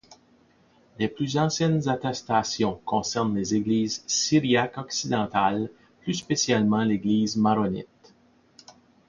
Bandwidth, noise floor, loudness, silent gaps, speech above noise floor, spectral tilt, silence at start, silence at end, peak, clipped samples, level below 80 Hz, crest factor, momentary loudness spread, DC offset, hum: 7.4 kHz; -60 dBFS; -25 LUFS; none; 36 dB; -4.5 dB/octave; 0.1 s; 0.35 s; -8 dBFS; under 0.1%; -58 dBFS; 18 dB; 9 LU; under 0.1%; none